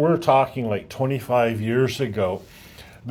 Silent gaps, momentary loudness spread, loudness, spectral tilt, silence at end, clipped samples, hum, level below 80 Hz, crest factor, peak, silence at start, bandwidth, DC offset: none; 9 LU; -22 LUFS; -7 dB/octave; 0 s; under 0.1%; none; -56 dBFS; 18 dB; -4 dBFS; 0 s; 17.5 kHz; under 0.1%